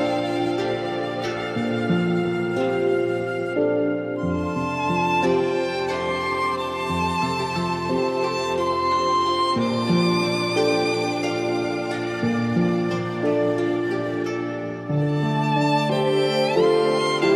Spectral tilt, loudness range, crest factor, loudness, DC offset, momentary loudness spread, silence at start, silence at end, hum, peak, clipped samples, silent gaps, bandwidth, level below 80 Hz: -6 dB/octave; 2 LU; 14 dB; -22 LUFS; under 0.1%; 5 LU; 0 s; 0 s; none; -8 dBFS; under 0.1%; none; 13 kHz; -54 dBFS